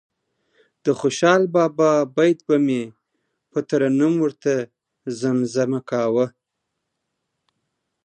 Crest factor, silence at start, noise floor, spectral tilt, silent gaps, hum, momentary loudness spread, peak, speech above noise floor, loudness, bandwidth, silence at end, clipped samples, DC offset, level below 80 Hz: 20 dB; 0.85 s; -79 dBFS; -6 dB/octave; none; none; 11 LU; -2 dBFS; 60 dB; -20 LUFS; 9.6 kHz; 1.75 s; under 0.1%; under 0.1%; -72 dBFS